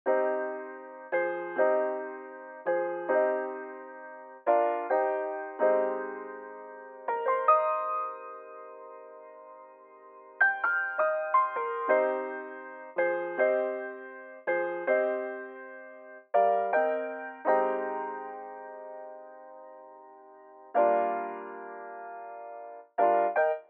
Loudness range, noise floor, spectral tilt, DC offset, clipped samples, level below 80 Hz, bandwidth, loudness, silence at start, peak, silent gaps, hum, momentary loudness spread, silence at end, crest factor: 5 LU; -52 dBFS; -2.5 dB/octave; under 0.1%; under 0.1%; under -90 dBFS; 4 kHz; -29 LUFS; 0.05 s; -12 dBFS; none; none; 20 LU; 0.05 s; 18 dB